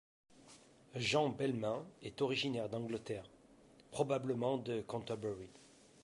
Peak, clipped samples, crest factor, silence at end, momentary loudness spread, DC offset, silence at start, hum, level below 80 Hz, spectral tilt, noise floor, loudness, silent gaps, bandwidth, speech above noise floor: -20 dBFS; under 0.1%; 20 dB; 0.35 s; 14 LU; under 0.1%; 0.4 s; none; -72 dBFS; -5 dB/octave; -64 dBFS; -39 LUFS; none; 11.5 kHz; 25 dB